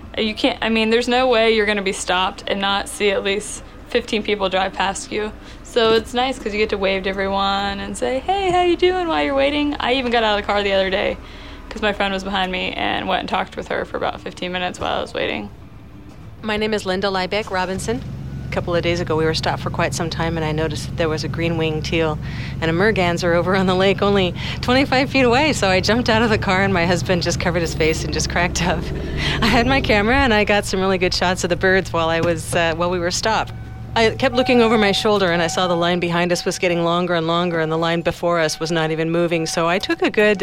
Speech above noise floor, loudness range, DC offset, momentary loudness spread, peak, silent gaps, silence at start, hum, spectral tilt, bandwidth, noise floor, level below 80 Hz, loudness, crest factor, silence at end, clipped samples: 21 dB; 6 LU; 0.5%; 8 LU; -4 dBFS; none; 0 s; none; -4.5 dB/octave; 16 kHz; -39 dBFS; -36 dBFS; -19 LUFS; 16 dB; 0 s; under 0.1%